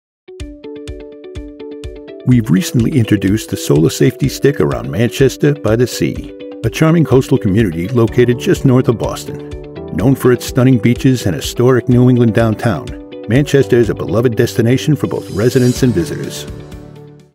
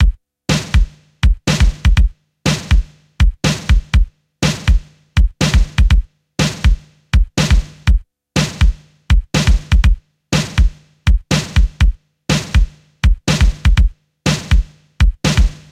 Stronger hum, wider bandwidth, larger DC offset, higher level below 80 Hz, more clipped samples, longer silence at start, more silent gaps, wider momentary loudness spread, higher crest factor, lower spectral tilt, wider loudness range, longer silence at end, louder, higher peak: neither; first, 16.5 kHz vs 12.5 kHz; neither; second, -34 dBFS vs -16 dBFS; neither; first, 0.3 s vs 0 s; neither; first, 18 LU vs 6 LU; about the same, 14 dB vs 14 dB; first, -6.5 dB/octave vs -5 dB/octave; about the same, 3 LU vs 1 LU; about the same, 0.25 s vs 0.2 s; first, -13 LUFS vs -17 LUFS; about the same, 0 dBFS vs 0 dBFS